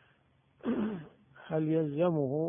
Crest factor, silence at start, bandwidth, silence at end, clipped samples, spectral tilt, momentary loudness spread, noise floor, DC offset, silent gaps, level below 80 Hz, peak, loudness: 16 dB; 0.65 s; 3.7 kHz; 0 s; under 0.1%; -12 dB/octave; 10 LU; -68 dBFS; under 0.1%; none; -70 dBFS; -16 dBFS; -32 LUFS